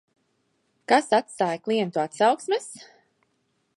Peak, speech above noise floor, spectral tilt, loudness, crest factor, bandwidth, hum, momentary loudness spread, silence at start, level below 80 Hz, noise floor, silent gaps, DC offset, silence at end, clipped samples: -4 dBFS; 48 dB; -4 dB/octave; -24 LUFS; 22 dB; 11.5 kHz; none; 18 LU; 0.9 s; -82 dBFS; -72 dBFS; none; under 0.1%; 0.95 s; under 0.1%